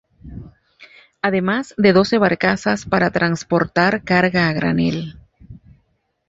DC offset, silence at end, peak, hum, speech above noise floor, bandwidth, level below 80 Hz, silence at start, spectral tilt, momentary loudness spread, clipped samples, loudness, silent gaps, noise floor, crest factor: under 0.1%; 0.7 s; -2 dBFS; none; 48 dB; 7.8 kHz; -48 dBFS; 0.25 s; -6 dB/octave; 16 LU; under 0.1%; -17 LUFS; none; -65 dBFS; 18 dB